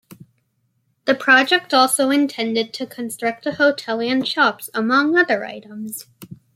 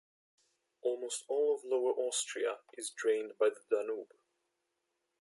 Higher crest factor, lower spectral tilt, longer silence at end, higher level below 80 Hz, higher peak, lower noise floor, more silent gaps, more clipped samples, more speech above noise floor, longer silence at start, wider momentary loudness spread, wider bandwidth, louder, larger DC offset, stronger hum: about the same, 18 dB vs 18 dB; first, -2.5 dB/octave vs 0 dB/octave; second, 0.2 s vs 1.15 s; first, -70 dBFS vs under -90 dBFS; first, -2 dBFS vs -18 dBFS; second, -67 dBFS vs -84 dBFS; neither; neither; about the same, 49 dB vs 50 dB; second, 0.1 s vs 0.85 s; first, 16 LU vs 9 LU; first, 16.5 kHz vs 11.5 kHz; first, -18 LUFS vs -35 LUFS; neither; neither